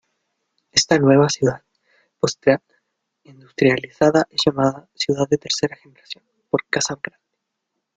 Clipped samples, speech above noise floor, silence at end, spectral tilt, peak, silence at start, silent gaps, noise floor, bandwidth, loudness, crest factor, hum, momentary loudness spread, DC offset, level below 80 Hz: under 0.1%; 59 dB; 1 s; -4.5 dB/octave; 0 dBFS; 0.75 s; none; -78 dBFS; 9.4 kHz; -19 LUFS; 22 dB; none; 19 LU; under 0.1%; -58 dBFS